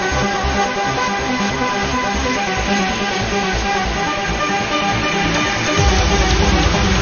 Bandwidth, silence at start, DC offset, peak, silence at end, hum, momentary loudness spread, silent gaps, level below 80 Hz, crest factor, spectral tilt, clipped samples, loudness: 7 kHz; 0 s; under 0.1%; -2 dBFS; 0 s; none; 4 LU; none; -24 dBFS; 16 dB; -4 dB/octave; under 0.1%; -17 LUFS